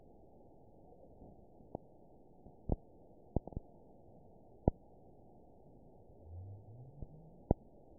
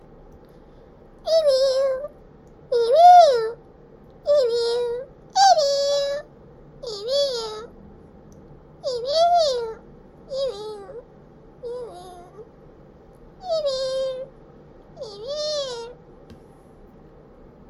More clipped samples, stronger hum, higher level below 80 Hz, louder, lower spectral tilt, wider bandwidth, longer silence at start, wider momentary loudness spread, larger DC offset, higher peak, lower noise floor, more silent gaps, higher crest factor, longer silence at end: neither; neither; about the same, -50 dBFS vs -54 dBFS; second, -44 LUFS vs -20 LUFS; first, -6 dB/octave vs -2 dB/octave; second, 1 kHz vs 12 kHz; second, 0.15 s vs 1.25 s; about the same, 24 LU vs 23 LU; neither; second, -10 dBFS vs -4 dBFS; first, -62 dBFS vs -48 dBFS; neither; first, 36 dB vs 20 dB; second, 0.05 s vs 1.35 s